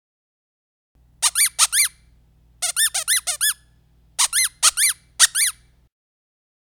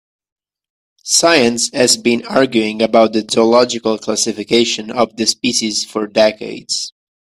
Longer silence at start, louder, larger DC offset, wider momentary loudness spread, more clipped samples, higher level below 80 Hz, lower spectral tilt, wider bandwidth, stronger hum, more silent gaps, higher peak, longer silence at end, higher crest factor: first, 1.2 s vs 1.05 s; second, -17 LUFS vs -14 LUFS; neither; second, 6 LU vs 9 LU; neither; about the same, -58 dBFS vs -56 dBFS; second, 4.5 dB/octave vs -2.5 dB/octave; first, over 20 kHz vs 14.5 kHz; first, 60 Hz at -65 dBFS vs none; neither; about the same, 0 dBFS vs 0 dBFS; first, 1.15 s vs 0.45 s; first, 22 dB vs 16 dB